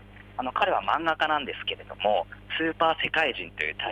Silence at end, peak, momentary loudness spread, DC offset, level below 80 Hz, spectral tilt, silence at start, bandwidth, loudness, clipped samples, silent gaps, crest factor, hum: 0 s; -10 dBFS; 8 LU; under 0.1%; -54 dBFS; -5 dB/octave; 0 s; 9.8 kHz; -27 LUFS; under 0.1%; none; 18 dB; 50 Hz at -50 dBFS